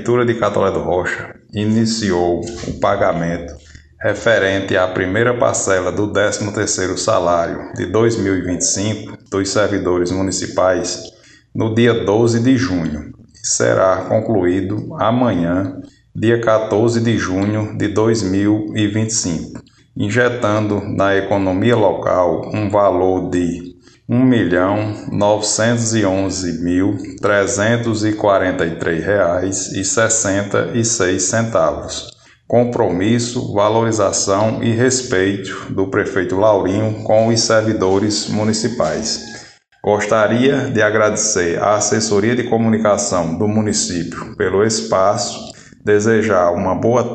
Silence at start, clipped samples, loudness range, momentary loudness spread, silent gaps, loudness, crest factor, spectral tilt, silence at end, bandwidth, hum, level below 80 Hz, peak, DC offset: 0 s; under 0.1%; 2 LU; 9 LU; none; -16 LUFS; 16 dB; -4.5 dB/octave; 0 s; 9.4 kHz; none; -46 dBFS; 0 dBFS; under 0.1%